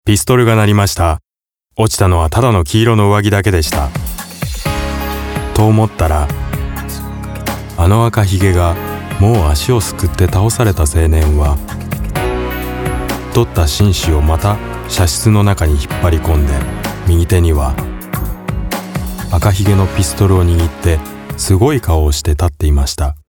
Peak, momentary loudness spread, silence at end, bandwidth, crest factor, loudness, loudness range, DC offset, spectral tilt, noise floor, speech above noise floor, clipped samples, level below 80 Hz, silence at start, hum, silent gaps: 0 dBFS; 11 LU; 0.1 s; 19 kHz; 12 dB; -14 LUFS; 3 LU; under 0.1%; -5.5 dB/octave; -67 dBFS; 56 dB; under 0.1%; -20 dBFS; 0.05 s; none; none